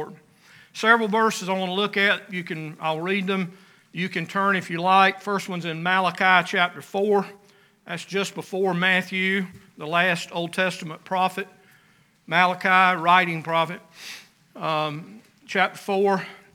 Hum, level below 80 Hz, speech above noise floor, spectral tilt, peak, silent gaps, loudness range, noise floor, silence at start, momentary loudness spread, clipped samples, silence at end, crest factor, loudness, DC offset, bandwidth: none; -78 dBFS; 36 dB; -4.5 dB/octave; -2 dBFS; none; 3 LU; -59 dBFS; 0 s; 16 LU; under 0.1%; 0.15 s; 22 dB; -22 LUFS; under 0.1%; 18 kHz